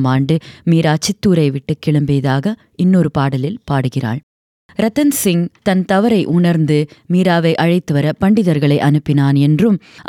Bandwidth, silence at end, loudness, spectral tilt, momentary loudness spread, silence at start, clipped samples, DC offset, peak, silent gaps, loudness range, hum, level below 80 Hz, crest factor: 17 kHz; 0.05 s; -15 LUFS; -6.5 dB/octave; 6 LU; 0 s; under 0.1%; under 0.1%; -2 dBFS; 4.23-4.69 s; 3 LU; none; -48 dBFS; 12 dB